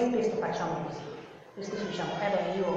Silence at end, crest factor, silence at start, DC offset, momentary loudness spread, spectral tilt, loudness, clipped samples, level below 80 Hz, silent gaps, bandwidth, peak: 0 s; 16 dB; 0 s; under 0.1%; 14 LU; -6 dB/octave; -32 LUFS; under 0.1%; -64 dBFS; none; 8 kHz; -16 dBFS